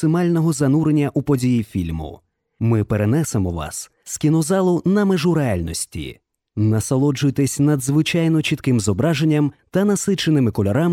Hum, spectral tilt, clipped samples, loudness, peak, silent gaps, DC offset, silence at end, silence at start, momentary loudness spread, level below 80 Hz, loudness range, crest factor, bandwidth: none; -6 dB/octave; under 0.1%; -19 LUFS; -6 dBFS; none; under 0.1%; 0 s; 0 s; 9 LU; -44 dBFS; 3 LU; 12 dB; 16.5 kHz